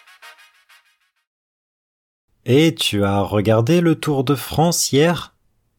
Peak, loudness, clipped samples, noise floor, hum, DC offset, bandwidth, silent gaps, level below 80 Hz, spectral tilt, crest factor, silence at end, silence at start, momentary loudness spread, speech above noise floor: -4 dBFS; -17 LUFS; under 0.1%; -62 dBFS; none; under 0.1%; 19 kHz; 1.27-2.28 s; -50 dBFS; -5 dB/octave; 16 dB; 0.55 s; 0.25 s; 5 LU; 45 dB